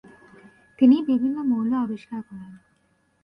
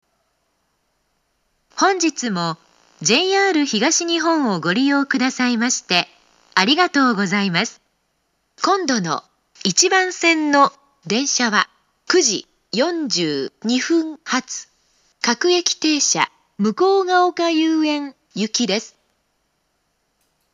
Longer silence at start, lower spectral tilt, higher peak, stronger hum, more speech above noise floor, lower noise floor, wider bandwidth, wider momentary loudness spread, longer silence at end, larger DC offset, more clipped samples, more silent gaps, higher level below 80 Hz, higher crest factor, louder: second, 0.8 s vs 1.75 s; first, -8.5 dB/octave vs -2.5 dB/octave; second, -6 dBFS vs 0 dBFS; neither; second, 45 dB vs 51 dB; about the same, -66 dBFS vs -69 dBFS; second, 5.2 kHz vs 12 kHz; first, 19 LU vs 9 LU; second, 0.7 s vs 1.65 s; neither; neither; neither; first, -66 dBFS vs -76 dBFS; about the same, 18 dB vs 20 dB; second, -22 LUFS vs -18 LUFS